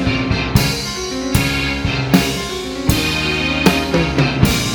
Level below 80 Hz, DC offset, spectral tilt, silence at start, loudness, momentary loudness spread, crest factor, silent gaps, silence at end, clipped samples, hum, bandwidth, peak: -28 dBFS; under 0.1%; -4.5 dB/octave; 0 s; -16 LUFS; 6 LU; 16 dB; none; 0 s; under 0.1%; none; over 20 kHz; 0 dBFS